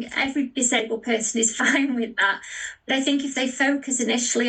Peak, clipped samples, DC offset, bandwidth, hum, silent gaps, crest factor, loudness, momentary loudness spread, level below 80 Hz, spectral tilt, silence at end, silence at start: -8 dBFS; under 0.1%; under 0.1%; 10 kHz; none; none; 16 dB; -22 LUFS; 5 LU; -64 dBFS; -1 dB/octave; 0 s; 0 s